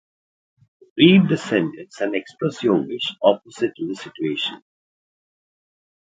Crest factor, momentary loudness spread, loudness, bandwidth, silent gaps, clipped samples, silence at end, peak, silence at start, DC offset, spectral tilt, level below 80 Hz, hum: 22 dB; 14 LU; -20 LUFS; 9 kHz; none; under 0.1%; 1.55 s; 0 dBFS; 0.95 s; under 0.1%; -6.5 dB/octave; -64 dBFS; none